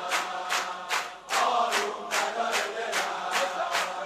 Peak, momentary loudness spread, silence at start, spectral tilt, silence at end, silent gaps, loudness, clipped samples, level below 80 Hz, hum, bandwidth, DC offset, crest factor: -12 dBFS; 4 LU; 0 s; 0 dB/octave; 0 s; none; -28 LUFS; under 0.1%; -72 dBFS; none; 15.5 kHz; under 0.1%; 18 dB